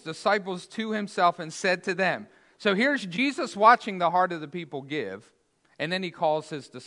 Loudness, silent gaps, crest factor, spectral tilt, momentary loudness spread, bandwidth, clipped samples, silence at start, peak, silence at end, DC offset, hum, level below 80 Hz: -26 LUFS; none; 22 dB; -4.5 dB/octave; 14 LU; 11 kHz; under 0.1%; 0.05 s; -4 dBFS; 0 s; under 0.1%; none; -80 dBFS